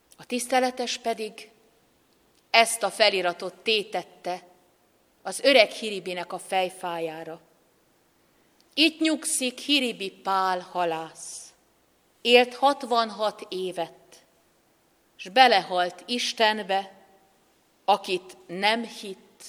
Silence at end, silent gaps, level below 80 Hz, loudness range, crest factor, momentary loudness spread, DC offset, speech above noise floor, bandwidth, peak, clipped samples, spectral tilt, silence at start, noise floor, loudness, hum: 0 s; none; -78 dBFS; 3 LU; 24 dB; 18 LU; under 0.1%; 39 dB; 15.5 kHz; -2 dBFS; under 0.1%; -2 dB/octave; 0.2 s; -65 dBFS; -24 LUFS; none